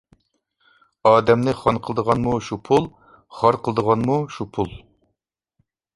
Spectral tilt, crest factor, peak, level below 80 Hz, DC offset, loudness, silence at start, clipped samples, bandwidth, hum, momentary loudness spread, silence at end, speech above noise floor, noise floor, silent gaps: -7 dB/octave; 20 dB; -2 dBFS; -50 dBFS; under 0.1%; -20 LUFS; 1.05 s; under 0.1%; 11.5 kHz; none; 11 LU; 1.15 s; 58 dB; -78 dBFS; none